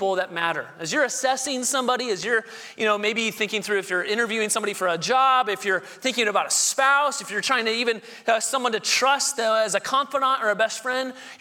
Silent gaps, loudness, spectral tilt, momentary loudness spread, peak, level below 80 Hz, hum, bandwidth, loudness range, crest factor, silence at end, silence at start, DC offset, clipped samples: none; -22 LUFS; -1 dB/octave; 7 LU; -6 dBFS; -76 dBFS; none; 19 kHz; 3 LU; 18 dB; 0.05 s; 0 s; under 0.1%; under 0.1%